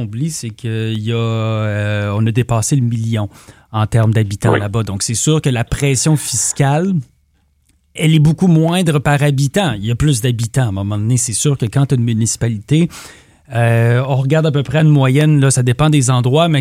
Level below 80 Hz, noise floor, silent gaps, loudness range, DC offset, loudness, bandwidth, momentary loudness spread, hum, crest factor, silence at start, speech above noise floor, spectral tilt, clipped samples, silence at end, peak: -40 dBFS; -58 dBFS; none; 3 LU; under 0.1%; -15 LUFS; 15.5 kHz; 8 LU; none; 14 dB; 0 s; 44 dB; -5.5 dB/octave; under 0.1%; 0 s; 0 dBFS